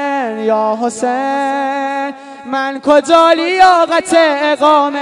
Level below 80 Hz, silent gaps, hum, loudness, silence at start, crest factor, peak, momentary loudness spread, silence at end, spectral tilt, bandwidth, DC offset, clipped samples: -54 dBFS; none; none; -12 LUFS; 0 s; 12 dB; 0 dBFS; 10 LU; 0 s; -3 dB/octave; 12 kHz; under 0.1%; 0.5%